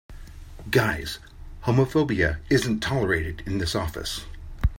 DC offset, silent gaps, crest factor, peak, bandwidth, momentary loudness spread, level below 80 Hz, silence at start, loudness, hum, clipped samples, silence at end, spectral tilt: under 0.1%; none; 18 dB; -6 dBFS; 16.5 kHz; 16 LU; -36 dBFS; 0.1 s; -25 LUFS; none; under 0.1%; 0.05 s; -5.5 dB/octave